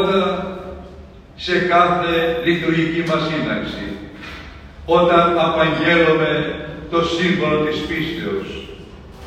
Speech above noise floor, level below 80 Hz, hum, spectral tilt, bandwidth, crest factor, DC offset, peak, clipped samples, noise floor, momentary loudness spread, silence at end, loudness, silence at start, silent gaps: 22 dB; -42 dBFS; none; -6 dB/octave; 14 kHz; 18 dB; under 0.1%; 0 dBFS; under 0.1%; -39 dBFS; 19 LU; 0 s; -17 LUFS; 0 s; none